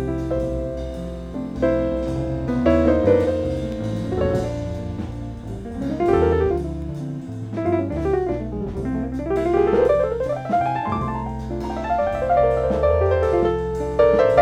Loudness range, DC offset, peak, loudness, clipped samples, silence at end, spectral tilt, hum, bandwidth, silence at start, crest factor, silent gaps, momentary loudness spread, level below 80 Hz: 3 LU; under 0.1%; -2 dBFS; -22 LUFS; under 0.1%; 0 s; -8.5 dB/octave; none; 10.5 kHz; 0 s; 18 dB; none; 13 LU; -34 dBFS